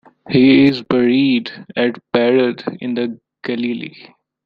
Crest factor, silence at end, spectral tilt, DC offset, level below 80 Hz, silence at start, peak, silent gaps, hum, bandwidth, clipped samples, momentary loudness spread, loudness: 14 dB; 0.55 s; -8 dB/octave; under 0.1%; -56 dBFS; 0.25 s; -2 dBFS; none; none; 5.2 kHz; under 0.1%; 14 LU; -16 LUFS